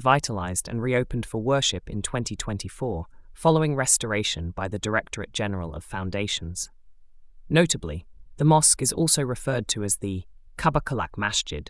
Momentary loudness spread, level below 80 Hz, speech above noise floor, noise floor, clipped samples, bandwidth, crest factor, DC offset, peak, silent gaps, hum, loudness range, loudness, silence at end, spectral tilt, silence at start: 12 LU; -44 dBFS; 22 dB; -47 dBFS; under 0.1%; 12 kHz; 20 dB; under 0.1%; -4 dBFS; none; none; 5 LU; -25 LUFS; 0.05 s; -3.5 dB/octave; 0 s